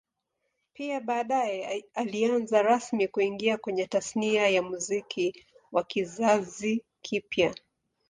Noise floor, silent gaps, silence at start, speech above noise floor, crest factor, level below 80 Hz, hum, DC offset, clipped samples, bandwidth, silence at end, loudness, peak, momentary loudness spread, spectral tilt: -81 dBFS; none; 0.8 s; 53 dB; 20 dB; -70 dBFS; none; under 0.1%; under 0.1%; 10 kHz; 0.55 s; -28 LUFS; -10 dBFS; 9 LU; -4 dB/octave